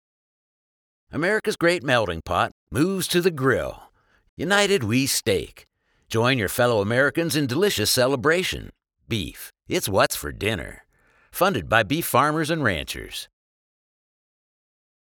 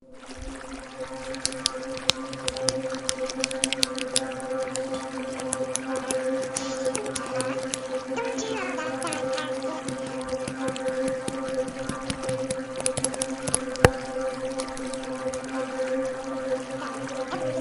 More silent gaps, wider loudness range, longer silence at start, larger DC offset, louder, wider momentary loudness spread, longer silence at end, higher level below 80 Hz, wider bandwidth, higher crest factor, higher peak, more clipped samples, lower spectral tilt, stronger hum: first, 2.52-2.67 s, 4.29-4.37 s vs none; about the same, 3 LU vs 3 LU; first, 1.1 s vs 0 s; neither; first, -22 LUFS vs -29 LUFS; first, 12 LU vs 7 LU; first, 1.8 s vs 0 s; about the same, -48 dBFS vs -50 dBFS; first, over 20 kHz vs 12.5 kHz; second, 22 dB vs 30 dB; about the same, -2 dBFS vs 0 dBFS; neither; about the same, -4 dB/octave vs -3 dB/octave; neither